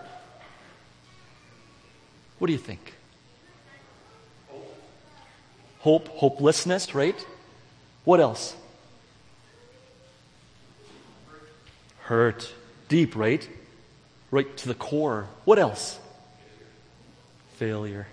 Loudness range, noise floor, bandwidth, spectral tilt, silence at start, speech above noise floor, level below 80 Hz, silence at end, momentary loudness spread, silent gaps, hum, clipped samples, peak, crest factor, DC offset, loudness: 12 LU; -56 dBFS; 10.5 kHz; -5.5 dB/octave; 0 s; 32 dB; -66 dBFS; 0.05 s; 25 LU; none; none; under 0.1%; -4 dBFS; 24 dB; under 0.1%; -25 LUFS